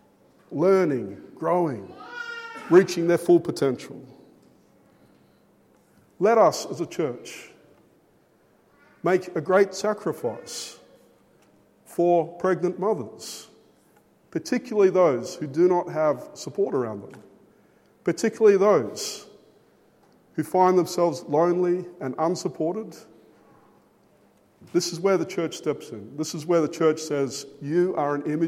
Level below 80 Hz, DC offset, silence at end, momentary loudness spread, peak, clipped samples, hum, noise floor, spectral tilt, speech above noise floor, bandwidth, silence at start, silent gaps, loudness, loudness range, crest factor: -76 dBFS; under 0.1%; 0 s; 17 LU; -4 dBFS; under 0.1%; none; -61 dBFS; -5.5 dB/octave; 38 dB; 15.5 kHz; 0.5 s; none; -24 LUFS; 5 LU; 22 dB